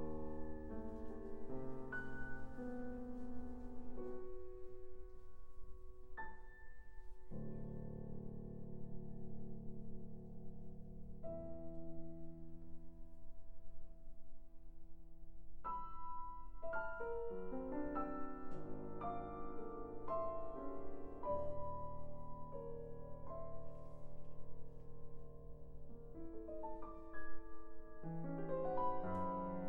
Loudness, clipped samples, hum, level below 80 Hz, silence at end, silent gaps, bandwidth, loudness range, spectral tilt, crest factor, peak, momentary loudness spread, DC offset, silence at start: -50 LUFS; under 0.1%; none; -54 dBFS; 0 s; none; 3 kHz; 9 LU; -9.5 dB/octave; 16 dB; -26 dBFS; 19 LU; under 0.1%; 0 s